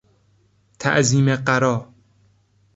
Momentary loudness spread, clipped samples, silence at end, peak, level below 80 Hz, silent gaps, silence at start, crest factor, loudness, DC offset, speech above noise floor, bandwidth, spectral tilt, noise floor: 8 LU; under 0.1%; 0.9 s; -2 dBFS; -56 dBFS; none; 0.8 s; 20 dB; -19 LUFS; under 0.1%; 42 dB; 8 kHz; -5 dB/octave; -60 dBFS